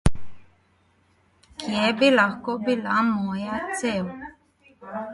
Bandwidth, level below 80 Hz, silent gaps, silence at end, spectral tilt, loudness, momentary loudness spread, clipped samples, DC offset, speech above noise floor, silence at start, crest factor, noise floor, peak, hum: 11.5 kHz; -40 dBFS; none; 0 s; -5 dB/octave; -24 LUFS; 18 LU; under 0.1%; under 0.1%; 39 dB; 0.05 s; 20 dB; -63 dBFS; -4 dBFS; none